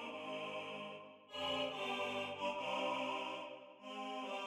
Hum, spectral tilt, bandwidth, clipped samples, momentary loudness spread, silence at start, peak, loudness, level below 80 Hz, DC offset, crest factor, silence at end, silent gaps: none; -3.5 dB/octave; 15 kHz; under 0.1%; 11 LU; 0 s; -28 dBFS; -42 LUFS; -84 dBFS; under 0.1%; 14 dB; 0 s; none